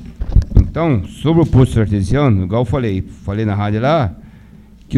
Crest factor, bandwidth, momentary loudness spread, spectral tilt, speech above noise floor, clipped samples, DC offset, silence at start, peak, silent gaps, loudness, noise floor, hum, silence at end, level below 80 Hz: 14 dB; 11.5 kHz; 8 LU; -8.5 dB/octave; 26 dB; under 0.1%; under 0.1%; 0 s; 0 dBFS; none; -16 LUFS; -41 dBFS; none; 0 s; -22 dBFS